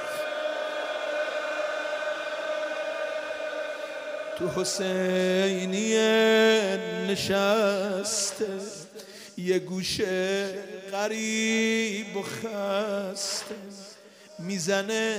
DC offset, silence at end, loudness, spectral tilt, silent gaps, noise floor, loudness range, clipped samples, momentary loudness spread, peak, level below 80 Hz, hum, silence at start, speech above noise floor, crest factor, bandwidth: under 0.1%; 0 s; -27 LUFS; -3.5 dB/octave; none; -49 dBFS; 7 LU; under 0.1%; 12 LU; -10 dBFS; -68 dBFS; none; 0 s; 23 dB; 18 dB; 16 kHz